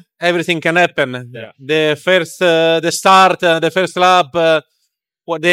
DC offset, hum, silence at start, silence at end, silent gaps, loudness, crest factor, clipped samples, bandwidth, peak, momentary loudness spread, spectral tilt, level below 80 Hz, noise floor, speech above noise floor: under 0.1%; none; 0.2 s; 0 s; none; -13 LUFS; 14 dB; under 0.1%; 16.5 kHz; 0 dBFS; 10 LU; -4 dB/octave; -62 dBFS; -69 dBFS; 56 dB